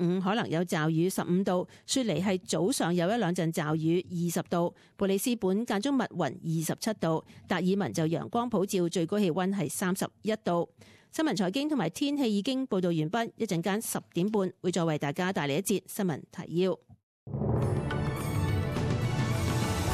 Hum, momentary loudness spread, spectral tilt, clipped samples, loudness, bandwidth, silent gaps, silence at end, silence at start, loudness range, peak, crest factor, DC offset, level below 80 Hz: none; 5 LU; -5.5 dB/octave; under 0.1%; -30 LUFS; 14.5 kHz; 17.03-17.27 s; 0 s; 0 s; 2 LU; -16 dBFS; 14 dB; under 0.1%; -50 dBFS